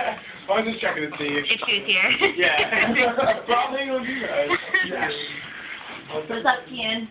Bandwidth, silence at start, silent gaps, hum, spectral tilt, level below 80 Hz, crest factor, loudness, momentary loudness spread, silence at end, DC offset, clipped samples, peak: 4 kHz; 0 s; none; none; -6.5 dB/octave; -58 dBFS; 20 dB; -21 LUFS; 14 LU; 0 s; under 0.1%; under 0.1%; -4 dBFS